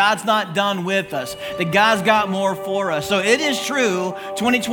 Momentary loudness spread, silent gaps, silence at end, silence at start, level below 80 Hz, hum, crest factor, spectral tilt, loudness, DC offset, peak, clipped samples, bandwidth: 9 LU; none; 0 s; 0 s; -58 dBFS; none; 18 dB; -3.5 dB/octave; -19 LUFS; under 0.1%; 0 dBFS; under 0.1%; 18 kHz